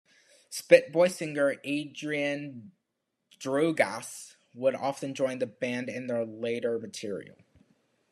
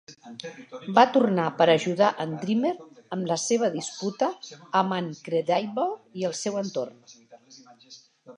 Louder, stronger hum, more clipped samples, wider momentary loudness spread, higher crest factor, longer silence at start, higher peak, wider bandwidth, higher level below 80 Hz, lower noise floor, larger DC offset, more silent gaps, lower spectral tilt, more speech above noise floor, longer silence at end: second, -29 LUFS vs -25 LUFS; neither; neither; about the same, 17 LU vs 18 LU; about the same, 26 dB vs 24 dB; first, 0.5 s vs 0.1 s; about the same, -4 dBFS vs -4 dBFS; first, 13 kHz vs 11 kHz; about the same, -82 dBFS vs -80 dBFS; first, -82 dBFS vs -53 dBFS; neither; neither; about the same, -4.5 dB/octave vs -4.5 dB/octave; first, 53 dB vs 27 dB; first, 0.85 s vs 0.05 s